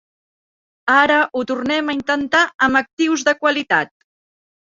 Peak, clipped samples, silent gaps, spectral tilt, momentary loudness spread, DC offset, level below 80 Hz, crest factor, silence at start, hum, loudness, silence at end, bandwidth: -2 dBFS; under 0.1%; 2.55-2.59 s, 2.93-2.97 s; -3 dB/octave; 6 LU; under 0.1%; -58 dBFS; 18 dB; 0.85 s; none; -17 LUFS; 0.9 s; 7.8 kHz